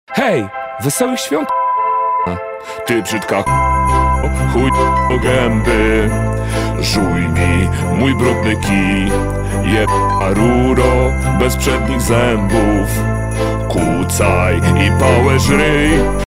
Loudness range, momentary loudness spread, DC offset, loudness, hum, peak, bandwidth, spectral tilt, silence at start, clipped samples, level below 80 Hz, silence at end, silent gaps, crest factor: 2 LU; 6 LU; 0.7%; -14 LUFS; none; 0 dBFS; 16 kHz; -5.5 dB/octave; 0.1 s; under 0.1%; -22 dBFS; 0 s; none; 14 dB